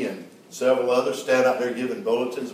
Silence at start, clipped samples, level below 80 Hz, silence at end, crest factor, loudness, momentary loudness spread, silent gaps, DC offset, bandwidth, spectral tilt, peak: 0 s; under 0.1%; -80 dBFS; 0 s; 16 dB; -23 LUFS; 11 LU; none; under 0.1%; 15.5 kHz; -4 dB/octave; -8 dBFS